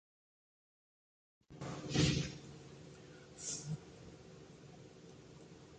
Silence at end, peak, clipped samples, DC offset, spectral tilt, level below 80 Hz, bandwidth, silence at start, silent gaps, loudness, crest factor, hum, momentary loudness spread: 0 s; -20 dBFS; under 0.1%; under 0.1%; -4.5 dB/octave; -60 dBFS; 9 kHz; 1.5 s; none; -39 LUFS; 24 dB; none; 23 LU